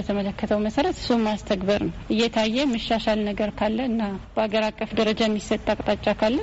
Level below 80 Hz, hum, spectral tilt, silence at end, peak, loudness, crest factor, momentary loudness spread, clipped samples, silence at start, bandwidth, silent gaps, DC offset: -44 dBFS; none; -4 dB/octave; 0 s; -8 dBFS; -24 LUFS; 16 dB; 4 LU; under 0.1%; 0 s; 8 kHz; none; under 0.1%